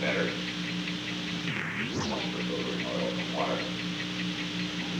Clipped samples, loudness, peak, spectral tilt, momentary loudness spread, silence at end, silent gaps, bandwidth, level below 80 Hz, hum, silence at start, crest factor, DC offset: under 0.1%; -31 LUFS; -14 dBFS; -4.5 dB/octave; 2 LU; 0 s; none; 12.5 kHz; -58 dBFS; 60 Hz at -45 dBFS; 0 s; 16 dB; under 0.1%